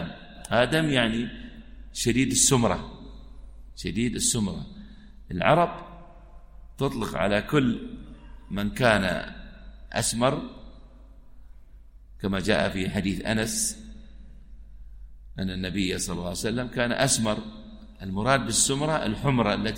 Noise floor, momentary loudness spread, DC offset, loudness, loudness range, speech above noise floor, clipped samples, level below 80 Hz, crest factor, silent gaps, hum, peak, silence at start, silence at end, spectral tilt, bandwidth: -48 dBFS; 21 LU; under 0.1%; -25 LUFS; 5 LU; 23 dB; under 0.1%; -44 dBFS; 22 dB; none; none; -6 dBFS; 0 s; 0 s; -4 dB/octave; 16 kHz